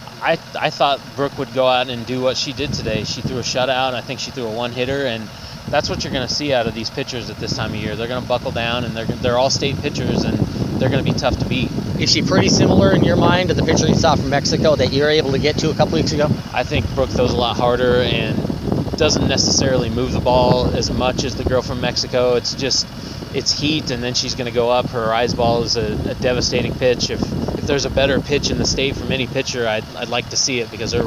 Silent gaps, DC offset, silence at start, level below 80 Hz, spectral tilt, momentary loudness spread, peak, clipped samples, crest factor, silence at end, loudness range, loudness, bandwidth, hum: none; under 0.1%; 0 s; -34 dBFS; -4.5 dB/octave; 8 LU; 0 dBFS; under 0.1%; 18 dB; 0 s; 6 LU; -18 LUFS; 16 kHz; none